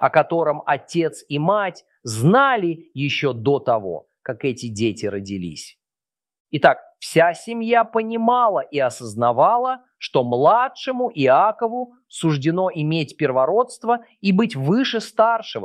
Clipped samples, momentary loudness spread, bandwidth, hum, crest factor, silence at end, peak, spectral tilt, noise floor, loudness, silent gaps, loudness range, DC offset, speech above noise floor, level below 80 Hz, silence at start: under 0.1%; 12 LU; 13.5 kHz; none; 18 dB; 0 s; -2 dBFS; -6 dB/octave; under -90 dBFS; -20 LUFS; 6.40-6.45 s; 5 LU; under 0.1%; over 70 dB; -66 dBFS; 0 s